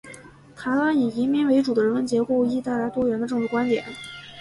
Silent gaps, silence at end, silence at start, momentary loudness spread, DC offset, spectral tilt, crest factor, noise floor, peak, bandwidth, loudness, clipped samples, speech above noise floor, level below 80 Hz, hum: none; 0 s; 0.05 s; 14 LU; under 0.1%; -6 dB/octave; 14 dB; -45 dBFS; -10 dBFS; 11.5 kHz; -23 LUFS; under 0.1%; 23 dB; -60 dBFS; none